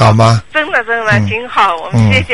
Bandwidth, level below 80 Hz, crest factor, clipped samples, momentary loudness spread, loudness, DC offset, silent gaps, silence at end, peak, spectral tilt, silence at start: 11 kHz; -34 dBFS; 10 dB; under 0.1%; 4 LU; -11 LUFS; 2%; none; 0 s; 0 dBFS; -6 dB/octave; 0 s